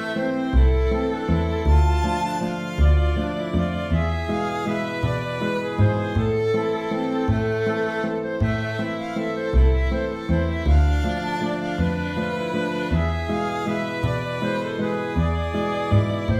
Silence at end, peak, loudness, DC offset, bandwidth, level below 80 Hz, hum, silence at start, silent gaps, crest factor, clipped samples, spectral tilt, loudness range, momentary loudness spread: 0 s; -8 dBFS; -23 LUFS; under 0.1%; 10 kHz; -26 dBFS; none; 0 s; none; 14 dB; under 0.1%; -7.5 dB/octave; 3 LU; 6 LU